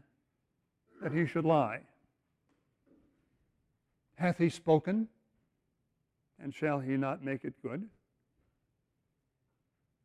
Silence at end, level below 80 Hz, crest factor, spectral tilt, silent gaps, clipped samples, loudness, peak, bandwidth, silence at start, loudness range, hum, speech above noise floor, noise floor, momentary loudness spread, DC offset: 2.15 s; -74 dBFS; 22 dB; -8 dB/octave; none; under 0.1%; -33 LUFS; -14 dBFS; 11.5 kHz; 1 s; 4 LU; none; 49 dB; -81 dBFS; 15 LU; under 0.1%